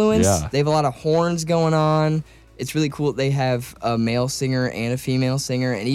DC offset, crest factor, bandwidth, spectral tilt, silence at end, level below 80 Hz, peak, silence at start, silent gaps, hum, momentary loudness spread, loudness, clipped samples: under 0.1%; 12 dB; 16 kHz; -5.5 dB/octave; 0 s; -46 dBFS; -8 dBFS; 0 s; none; none; 6 LU; -21 LUFS; under 0.1%